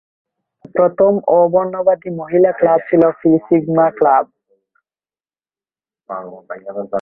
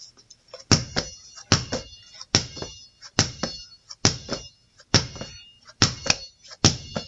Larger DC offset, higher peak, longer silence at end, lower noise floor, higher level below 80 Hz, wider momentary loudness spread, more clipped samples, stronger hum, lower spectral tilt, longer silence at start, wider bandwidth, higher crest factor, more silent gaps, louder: neither; about the same, 0 dBFS vs 0 dBFS; about the same, 0 s vs 0 s; first, under -90 dBFS vs -51 dBFS; second, -60 dBFS vs -48 dBFS; second, 16 LU vs 21 LU; neither; neither; first, -11.5 dB/octave vs -3 dB/octave; first, 0.75 s vs 0 s; second, 3 kHz vs 8.4 kHz; second, 16 dB vs 26 dB; neither; first, -14 LUFS vs -24 LUFS